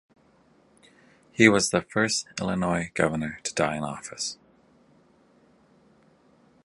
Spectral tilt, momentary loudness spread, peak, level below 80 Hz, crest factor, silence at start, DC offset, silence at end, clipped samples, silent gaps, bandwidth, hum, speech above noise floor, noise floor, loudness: -4 dB/octave; 14 LU; -2 dBFS; -56 dBFS; 26 dB; 1.4 s; under 0.1%; 2.3 s; under 0.1%; none; 11.5 kHz; none; 36 dB; -61 dBFS; -25 LUFS